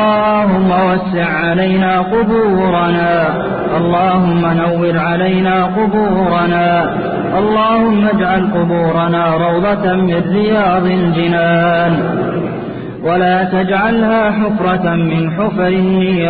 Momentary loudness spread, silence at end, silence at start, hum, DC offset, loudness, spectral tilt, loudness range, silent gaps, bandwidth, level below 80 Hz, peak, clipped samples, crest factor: 4 LU; 0 s; 0 s; none; under 0.1%; -13 LUFS; -12.5 dB/octave; 1 LU; none; 4.8 kHz; -40 dBFS; -2 dBFS; under 0.1%; 10 dB